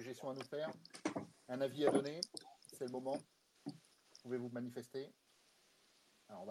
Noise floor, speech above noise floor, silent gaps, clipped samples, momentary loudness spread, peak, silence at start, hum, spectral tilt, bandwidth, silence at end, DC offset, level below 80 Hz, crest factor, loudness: -73 dBFS; 31 dB; none; under 0.1%; 19 LU; -20 dBFS; 0 s; none; -5 dB/octave; 15 kHz; 0 s; under 0.1%; under -90 dBFS; 26 dB; -44 LUFS